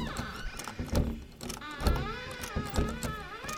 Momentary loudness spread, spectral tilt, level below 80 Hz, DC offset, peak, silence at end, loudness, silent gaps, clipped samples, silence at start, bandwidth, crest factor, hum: 8 LU; -5 dB/octave; -38 dBFS; under 0.1%; -14 dBFS; 0 s; -35 LUFS; none; under 0.1%; 0 s; 19 kHz; 22 dB; none